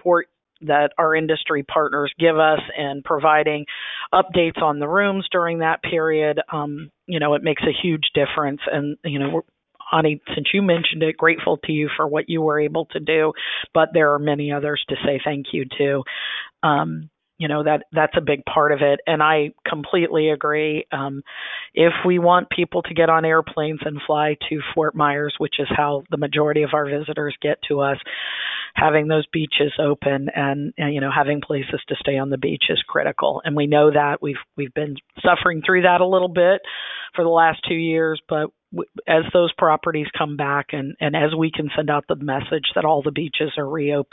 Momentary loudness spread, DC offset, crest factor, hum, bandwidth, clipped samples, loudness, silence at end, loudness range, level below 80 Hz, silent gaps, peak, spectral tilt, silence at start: 9 LU; under 0.1%; 18 dB; none; 4 kHz; under 0.1%; -20 LUFS; 0.1 s; 3 LU; -56 dBFS; none; -2 dBFS; -10.5 dB/octave; 0.05 s